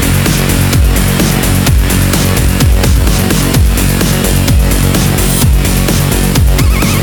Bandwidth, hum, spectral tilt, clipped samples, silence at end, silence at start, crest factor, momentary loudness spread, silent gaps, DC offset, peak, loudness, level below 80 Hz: over 20 kHz; none; -4.5 dB/octave; under 0.1%; 0 s; 0 s; 8 dB; 1 LU; none; under 0.1%; 0 dBFS; -10 LUFS; -12 dBFS